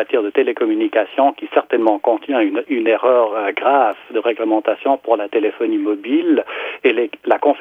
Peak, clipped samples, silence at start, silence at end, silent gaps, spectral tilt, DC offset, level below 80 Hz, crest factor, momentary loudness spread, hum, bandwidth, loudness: 0 dBFS; under 0.1%; 0 s; 0 s; none; -6 dB/octave; under 0.1%; -72 dBFS; 16 dB; 4 LU; none; 3.8 kHz; -17 LUFS